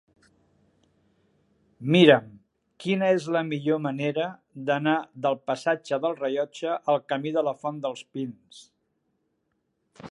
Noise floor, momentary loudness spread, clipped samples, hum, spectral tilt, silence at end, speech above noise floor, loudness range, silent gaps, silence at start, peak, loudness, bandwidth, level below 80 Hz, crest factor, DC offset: -75 dBFS; 15 LU; under 0.1%; none; -6.5 dB/octave; 0 s; 50 dB; 6 LU; none; 1.8 s; -2 dBFS; -25 LUFS; 11 kHz; -74 dBFS; 26 dB; under 0.1%